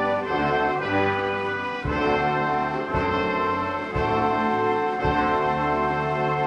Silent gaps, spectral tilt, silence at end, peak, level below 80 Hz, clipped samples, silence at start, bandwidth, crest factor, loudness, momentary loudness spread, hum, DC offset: none; -7 dB/octave; 0 s; -10 dBFS; -42 dBFS; under 0.1%; 0 s; 10 kHz; 14 dB; -23 LUFS; 3 LU; none; under 0.1%